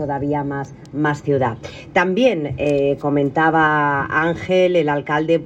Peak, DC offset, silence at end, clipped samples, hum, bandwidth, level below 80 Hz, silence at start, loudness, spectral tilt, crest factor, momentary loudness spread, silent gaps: -4 dBFS; under 0.1%; 0 s; under 0.1%; none; 8.6 kHz; -48 dBFS; 0 s; -18 LUFS; -7 dB/octave; 14 dB; 7 LU; none